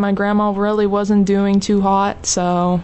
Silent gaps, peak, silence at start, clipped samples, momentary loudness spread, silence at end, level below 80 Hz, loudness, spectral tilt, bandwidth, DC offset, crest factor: none; -6 dBFS; 0 s; under 0.1%; 2 LU; 0 s; -42 dBFS; -16 LUFS; -5.5 dB/octave; 8.4 kHz; under 0.1%; 10 dB